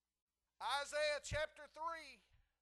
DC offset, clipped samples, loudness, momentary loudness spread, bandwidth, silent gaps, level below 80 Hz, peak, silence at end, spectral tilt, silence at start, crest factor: under 0.1%; under 0.1%; -43 LUFS; 10 LU; 12.5 kHz; none; -64 dBFS; -26 dBFS; 0.45 s; -2 dB/octave; 0.6 s; 18 dB